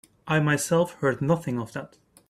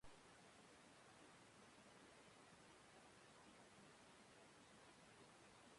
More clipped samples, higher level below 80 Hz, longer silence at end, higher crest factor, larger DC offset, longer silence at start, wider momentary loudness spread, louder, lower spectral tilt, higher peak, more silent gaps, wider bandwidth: neither; first, -62 dBFS vs -86 dBFS; first, 0.45 s vs 0 s; about the same, 16 dB vs 16 dB; neither; first, 0.25 s vs 0 s; first, 10 LU vs 0 LU; first, -25 LUFS vs -67 LUFS; first, -5.5 dB/octave vs -3 dB/octave; first, -10 dBFS vs -50 dBFS; neither; first, 15 kHz vs 11.5 kHz